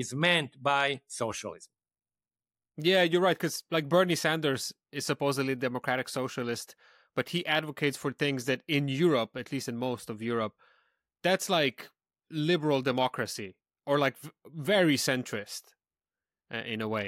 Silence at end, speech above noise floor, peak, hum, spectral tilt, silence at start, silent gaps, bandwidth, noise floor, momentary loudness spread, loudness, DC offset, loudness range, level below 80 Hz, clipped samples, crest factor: 0 s; over 60 dB; -10 dBFS; none; -4.5 dB/octave; 0 s; none; 16 kHz; under -90 dBFS; 13 LU; -29 LUFS; under 0.1%; 3 LU; -74 dBFS; under 0.1%; 20 dB